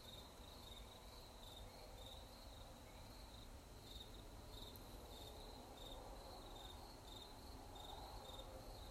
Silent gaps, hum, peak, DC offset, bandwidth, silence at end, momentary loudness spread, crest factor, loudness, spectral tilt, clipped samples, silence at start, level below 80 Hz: none; none; -40 dBFS; under 0.1%; 16 kHz; 0 s; 4 LU; 18 dB; -57 LUFS; -4 dB/octave; under 0.1%; 0 s; -62 dBFS